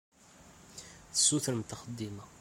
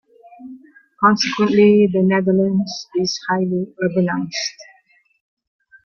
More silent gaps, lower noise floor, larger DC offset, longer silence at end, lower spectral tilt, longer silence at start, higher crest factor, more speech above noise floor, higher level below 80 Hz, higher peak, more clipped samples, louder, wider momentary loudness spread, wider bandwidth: neither; about the same, -58 dBFS vs -56 dBFS; neither; second, 0 s vs 1.2 s; second, -3 dB/octave vs -5.5 dB/octave; about the same, 0.4 s vs 0.4 s; first, 22 dB vs 16 dB; second, 24 dB vs 40 dB; second, -66 dBFS vs -60 dBFS; second, -14 dBFS vs -2 dBFS; neither; second, -31 LUFS vs -17 LUFS; first, 23 LU vs 11 LU; first, 16.5 kHz vs 7 kHz